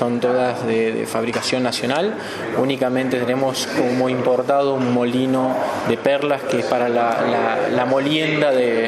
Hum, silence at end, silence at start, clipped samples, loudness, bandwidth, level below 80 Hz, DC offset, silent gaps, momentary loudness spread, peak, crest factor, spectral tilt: none; 0 s; 0 s; under 0.1%; -19 LUFS; 13.5 kHz; -62 dBFS; under 0.1%; none; 4 LU; -2 dBFS; 16 dB; -5 dB/octave